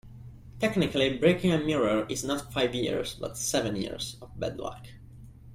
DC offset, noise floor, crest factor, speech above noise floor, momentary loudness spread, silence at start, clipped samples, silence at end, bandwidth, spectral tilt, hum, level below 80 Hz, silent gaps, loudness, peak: under 0.1%; -48 dBFS; 20 dB; 20 dB; 17 LU; 0.05 s; under 0.1%; 0 s; 16 kHz; -4.5 dB/octave; none; -52 dBFS; none; -28 LUFS; -8 dBFS